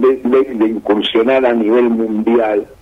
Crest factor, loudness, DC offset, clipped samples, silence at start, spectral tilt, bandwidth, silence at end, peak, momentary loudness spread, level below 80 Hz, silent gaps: 12 dB; -14 LUFS; under 0.1%; under 0.1%; 0 s; -7 dB/octave; 5 kHz; 0.15 s; 0 dBFS; 4 LU; -50 dBFS; none